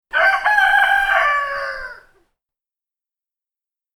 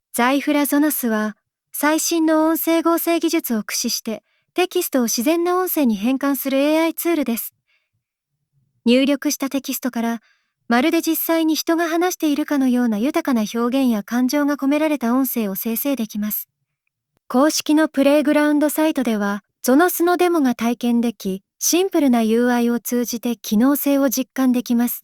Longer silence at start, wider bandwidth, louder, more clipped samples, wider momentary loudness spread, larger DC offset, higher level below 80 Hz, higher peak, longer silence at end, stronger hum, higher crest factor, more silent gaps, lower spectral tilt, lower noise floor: about the same, 0.15 s vs 0.15 s; about the same, 19 kHz vs over 20 kHz; first, -15 LUFS vs -19 LUFS; neither; first, 15 LU vs 7 LU; neither; first, -48 dBFS vs -64 dBFS; about the same, -2 dBFS vs -2 dBFS; first, 2 s vs 0.05 s; neither; about the same, 16 dB vs 16 dB; neither; second, 0 dB/octave vs -3.5 dB/octave; first, -90 dBFS vs -78 dBFS